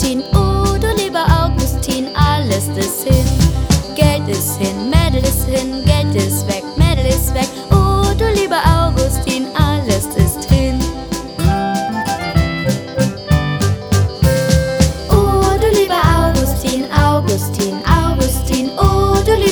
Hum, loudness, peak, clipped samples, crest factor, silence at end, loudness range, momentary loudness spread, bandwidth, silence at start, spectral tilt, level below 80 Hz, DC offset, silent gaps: none; -15 LUFS; 0 dBFS; under 0.1%; 14 dB; 0 s; 3 LU; 5 LU; over 20 kHz; 0 s; -5.5 dB/octave; -20 dBFS; under 0.1%; none